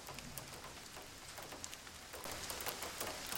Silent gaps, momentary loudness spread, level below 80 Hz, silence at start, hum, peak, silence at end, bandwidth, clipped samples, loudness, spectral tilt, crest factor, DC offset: none; 8 LU; -64 dBFS; 0 s; none; -20 dBFS; 0 s; 17 kHz; under 0.1%; -46 LUFS; -1.5 dB/octave; 28 dB; under 0.1%